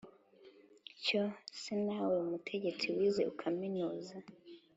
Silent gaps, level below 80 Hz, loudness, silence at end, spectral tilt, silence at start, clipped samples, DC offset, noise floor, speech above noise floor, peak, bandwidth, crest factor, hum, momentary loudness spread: none; -80 dBFS; -37 LUFS; 0.2 s; -5 dB/octave; 0.05 s; under 0.1%; under 0.1%; -62 dBFS; 25 dB; -22 dBFS; 8 kHz; 16 dB; none; 20 LU